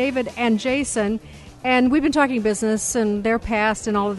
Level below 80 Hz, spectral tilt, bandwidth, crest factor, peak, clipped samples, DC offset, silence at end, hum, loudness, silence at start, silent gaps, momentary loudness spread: -44 dBFS; -4 dB/octave; 12 kHz; 16 dB; -6 dBFS; under 0.1%; under 0.1%; 0 s; none; -20 LUFS; 0 s; none; 5 LU